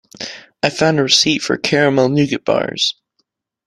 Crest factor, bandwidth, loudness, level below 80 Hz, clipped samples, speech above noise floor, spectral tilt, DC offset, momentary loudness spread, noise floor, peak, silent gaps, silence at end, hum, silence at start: 16 dB; 12.5 kHz; -15 LUFS; -54 dBFS; under 0.1%; 53 dB; -4 dB/octave; under 0.1%; 17 LU; -69 dBFS; 0 dBFS; none; 0.75 s; none; 0.2 s